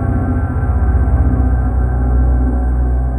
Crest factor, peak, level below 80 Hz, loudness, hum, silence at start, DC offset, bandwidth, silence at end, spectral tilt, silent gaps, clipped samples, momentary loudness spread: 12 dB; -2 dBFS; -14 dBFS; -16 LUFS; none; 0 s; under 0.1%; 2.3 kHz; 0 s; -11.5 dB/octave; none; under 0.1%; 3 LU